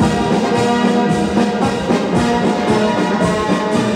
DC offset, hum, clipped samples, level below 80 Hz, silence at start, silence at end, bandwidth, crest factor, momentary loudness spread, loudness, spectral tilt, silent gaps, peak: under 0.1%; none; under 0.1%; -38 dBFS; 0 s; 0 s; 14 kHz; 12 dB; 2 LU; -15 LUFS; -6 dB/octave; none; -2 dBFS